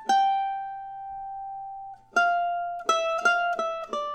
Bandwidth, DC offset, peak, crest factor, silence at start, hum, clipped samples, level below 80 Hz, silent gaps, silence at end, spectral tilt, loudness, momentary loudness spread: 12 kHz; under 0.1%; -10 dBFS; 18 dB; 0 s; none; under 0.1%; -64 dBFS; none; 0 s; -1 dB/octave; -26 LUFS; 15 LU